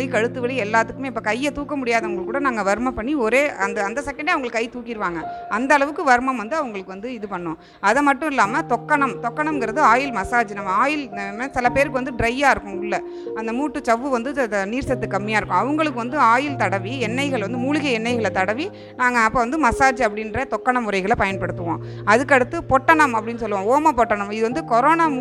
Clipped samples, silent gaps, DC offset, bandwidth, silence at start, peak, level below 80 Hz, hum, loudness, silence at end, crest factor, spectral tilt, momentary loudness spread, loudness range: under 0.1%; none; under 0.1%; 13 kHz; 0 s; 0 dBFS; -46 dBFS; none; -20 LUFS; 0 s; 20 dB; -5 dB/octave; 9 LU; 3 LU